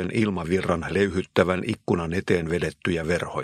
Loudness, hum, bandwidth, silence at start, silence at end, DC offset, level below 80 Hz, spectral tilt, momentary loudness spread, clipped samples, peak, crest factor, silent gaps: -25 LUFS; none; 13.5 kHz; 0 s; 0 s; under 0.1%; -46 dBFS; -6.5 dB/octave; 4 LU; under 0.1%; -2 dBFS; 24 dB; none